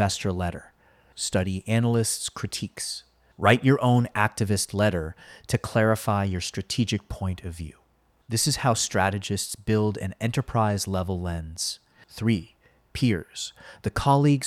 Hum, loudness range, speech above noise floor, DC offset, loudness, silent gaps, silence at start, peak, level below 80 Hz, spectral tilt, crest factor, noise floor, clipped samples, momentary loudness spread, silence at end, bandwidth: none; 4 LU; 39 dB; under 0.1%; -26 LUFS; none; 0 s; -4 dBFS; -48 dBFS; -5 dB/octave; 20 dB; -64 dBFS; under 0.1%; 13 LU; 0 s; 15.5 kHz